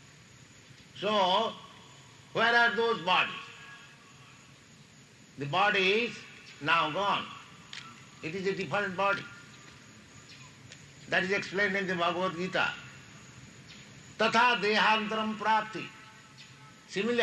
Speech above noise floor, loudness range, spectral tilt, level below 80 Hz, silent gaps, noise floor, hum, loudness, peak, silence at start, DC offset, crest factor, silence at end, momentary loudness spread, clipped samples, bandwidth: 27 dB; 5 LU; -4 dB/octave; -72 dBFS; none; -56 dBFS; none; -28 LUFS; -12 dBFS; 0.8 s; under 0.1%; 20 dB; 0 s; 25 LU; under 0.1%; 12 kHz